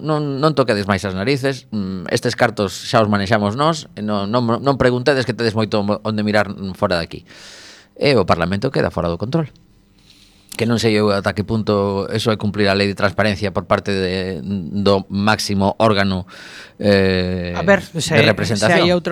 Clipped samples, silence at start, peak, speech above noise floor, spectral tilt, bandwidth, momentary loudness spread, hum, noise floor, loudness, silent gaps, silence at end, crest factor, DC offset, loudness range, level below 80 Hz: under 0.1%; 0 s; 0 dBFS; 33 dB; -5.5 dB/octave; 18.5 kHz; 9 LU; none; -50 dBFS; -18 LUFS; none; 0 s; 18 dB; under 0.1%; 3 LU; -46 dBFS